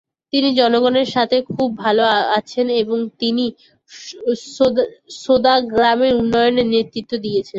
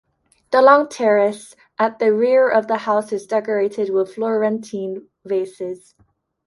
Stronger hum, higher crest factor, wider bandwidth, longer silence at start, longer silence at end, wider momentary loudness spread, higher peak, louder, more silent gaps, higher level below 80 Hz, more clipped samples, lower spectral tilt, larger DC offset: neither; about the same, 16 dB vs 18 dB; second, 7.8 kHz vs 11.5 kHz; second, 0.35 s vs 0.5 s; second, 0 s vs 0.7 s; second, 10 LU vs 16 LU; about the same, -2 dBFS vs 0 dBFS; about the same, -17 LUFS vs -18 LUFS; neither; first, -52 dBFS vs -70 dBFS; neither; about the same, -5 dB/octave vs -5.5 dB/octave; neither